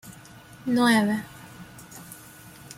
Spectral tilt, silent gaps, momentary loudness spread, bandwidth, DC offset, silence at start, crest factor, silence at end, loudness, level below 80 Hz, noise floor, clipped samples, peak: -4.5 dB/octave; none; 25 LU; 16.5 kHz; under 0.1%; 0.05 s; 20 dB; 0.05 s; -23 LUFS; -62 dBFS; -47 dBFS; under 0.1%; -8 dBFS